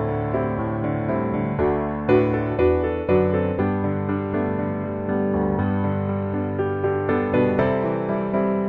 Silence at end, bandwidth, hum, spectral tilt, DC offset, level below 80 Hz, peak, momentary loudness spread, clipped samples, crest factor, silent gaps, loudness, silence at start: 0 s; 4.7 kHz; none; -11 dB/octave; under 0.1%; -42 dBFS; -6 dBFS; 5 LU; under 0.1%; 16 dB; none; -22 LUFS; 0 s